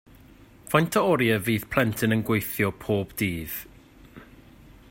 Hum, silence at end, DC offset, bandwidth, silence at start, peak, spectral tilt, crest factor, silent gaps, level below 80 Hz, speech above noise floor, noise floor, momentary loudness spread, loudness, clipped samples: none; 0.65 s; under 0.1%; 16.5 kHz; 0.7 s; -6 dBFS; -5.5 dB/octave; 20 dB; none; -52 dBFS; 27 dB; -51 dBFS; 7 LU; -25 LUFS; under 0.1%